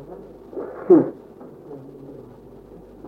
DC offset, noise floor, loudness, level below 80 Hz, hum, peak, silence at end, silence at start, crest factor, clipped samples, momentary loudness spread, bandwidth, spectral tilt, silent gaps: under 0.1%; -43 dBFS; -19 LUFS; -58 dBFS; none; -2 dBFS; 0 s; 0.1 s; 22 dB; under 0.1%; 27 LU; 2.4 kHz; -11 dB/octave; none